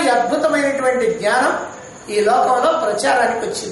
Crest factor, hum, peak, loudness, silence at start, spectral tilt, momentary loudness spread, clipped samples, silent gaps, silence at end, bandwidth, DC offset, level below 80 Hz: 12 dB; none; -4 dBFS; -17 LUFS; 0 s; -3 dB/octave; 8 LU; under 0.1%; none; 0 s; 11.5 kHz; under 0.1%; -56 dBFS